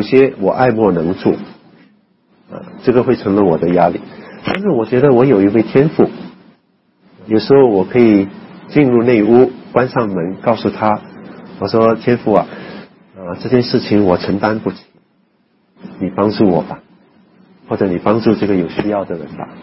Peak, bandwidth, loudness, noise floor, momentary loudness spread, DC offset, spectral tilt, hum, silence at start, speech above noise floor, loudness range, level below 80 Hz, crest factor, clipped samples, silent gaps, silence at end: 0 dBFS; 5.8 kHz; -14 LUFS; -57 dBFS; 18 LU; under 0.1%; -10.5 dB/octave; none; 0 s; 45 dB; 5 LU; -50 dBFS; 14 dB; under 0.1%; none; 0 s